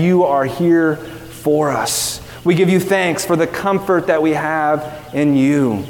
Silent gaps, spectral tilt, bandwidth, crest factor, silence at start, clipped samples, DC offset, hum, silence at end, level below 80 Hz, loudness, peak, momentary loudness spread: none; -5 dB/octave; 18 kHz; 14 dB; 0 s; under 0.1%; under 0.1%; none; 0 s; -48 dBFS; -16 LUFS; -2 dBFS; 8 LU